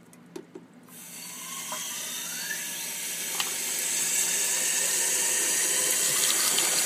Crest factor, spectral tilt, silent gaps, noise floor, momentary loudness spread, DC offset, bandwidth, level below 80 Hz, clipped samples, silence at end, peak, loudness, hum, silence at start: 22 dB; 1 dB/octave; none; -48 dBFS; 18 LU; under 0.1%; 15.5 kHz; -86 dBFS; under 0.1%; 0 s; -6 dBFS; -25 LUFS; none; 0.1 s